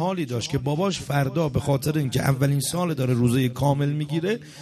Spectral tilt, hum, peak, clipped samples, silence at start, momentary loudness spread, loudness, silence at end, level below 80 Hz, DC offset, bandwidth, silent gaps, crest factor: -6 dB/octave; none; -10 dBFS; under 0.1%; 0 s; 4 LU; -24 LUFS; 0 s; -48 dBFS; under 0.1%; 14 kHz; none; 14 dB